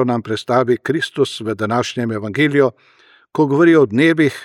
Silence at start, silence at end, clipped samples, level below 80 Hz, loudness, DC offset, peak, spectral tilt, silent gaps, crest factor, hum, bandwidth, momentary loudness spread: 0 s; 0 s; under 0.1%; -64 dBFS; -16 LUFS; under 0.1%; -2 dBFS; -6 dB/octave; none; 14 dB; none; 12 kHz; 10 LU